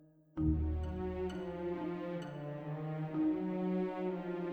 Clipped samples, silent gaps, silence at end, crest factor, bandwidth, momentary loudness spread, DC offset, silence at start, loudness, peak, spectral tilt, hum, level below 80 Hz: under 0.1%; none; 0 s; 18 dB; 8.4 kHz; 8 LU; under 0.1%; 0 s; -38 LUFS; -20 dBFS; -9.5 dB/octave; none; -46 dBFS